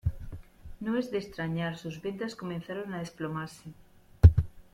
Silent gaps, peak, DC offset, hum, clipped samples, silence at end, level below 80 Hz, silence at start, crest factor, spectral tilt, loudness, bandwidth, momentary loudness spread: none; -4 dBFS; under 0.1%; none; under 0.1%; 0.1 s; -38 dBFS; 0.05 s; 24 dB; -8 dB/octave; -30 LUFS; 9.8 kHz; 25 LU